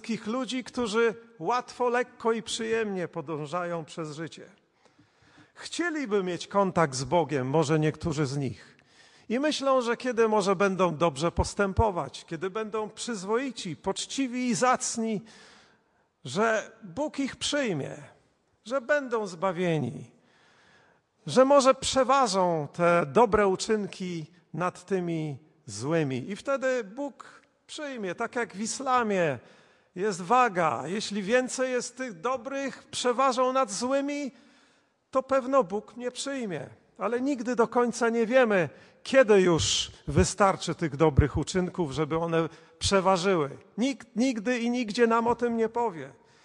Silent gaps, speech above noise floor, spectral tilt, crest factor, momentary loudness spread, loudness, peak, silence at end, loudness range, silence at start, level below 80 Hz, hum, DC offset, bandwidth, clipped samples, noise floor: none; 42 dB; -4.5 dB/octave; 20 dB; 13 LU; -27 LUFS; -8 dBFS; 0.35 s; 7 LU; 0.05 s; -50 dBFS; none; under 0.1%; 11.5 kHz; under 0.1%; -69 dBFS